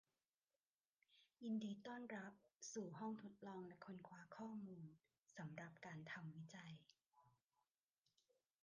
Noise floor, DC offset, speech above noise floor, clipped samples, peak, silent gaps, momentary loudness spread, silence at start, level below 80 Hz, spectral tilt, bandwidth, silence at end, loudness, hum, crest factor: under -90 dBFS; under 0.1%; over 36 dB; under 0.1%; -40 dBFS; 2.56-2.60 s, 5.18-5.23 s, 7.06-7.10 s; 12 LU; 1.1 s; under -90 dBFS; -5.5 dB/octave; 9.4 kHz; 1.35 s; -55 LUFS; none; 18 dB